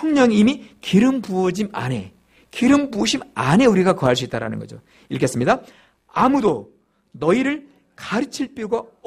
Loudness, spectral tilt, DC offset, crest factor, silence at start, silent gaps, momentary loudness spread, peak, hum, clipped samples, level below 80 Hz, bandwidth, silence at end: -19 LUFS; -5.5 dB/octave; under 0.1%; 18 dB; 0 s; none; 14 LU; -2 dBFS; none; under 0.1%; -52 dBFS; 14 kHz; 0.25 s